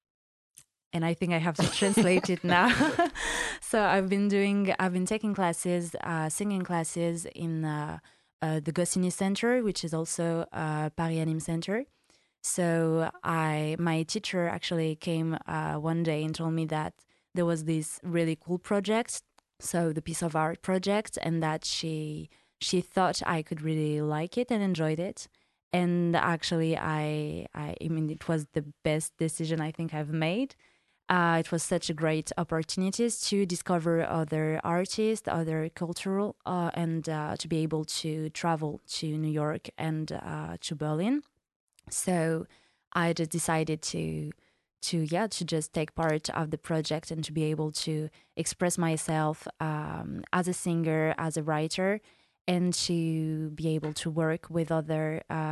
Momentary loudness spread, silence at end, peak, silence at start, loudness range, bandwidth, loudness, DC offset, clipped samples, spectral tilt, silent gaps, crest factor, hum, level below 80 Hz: 8 LU; 0 s; -6 dBFS; 0.95 s; 5 LU; 12.5 kHz; -30 LUFS; under 0.1%; under 0.1%; -5 dB/octave; 8.33-8.39 s, 25.63-25.71 s, 41.56-41.67 s, 42.87-42.91 s, 52.41-52.45 s; 24 dB; none; -60 dBFS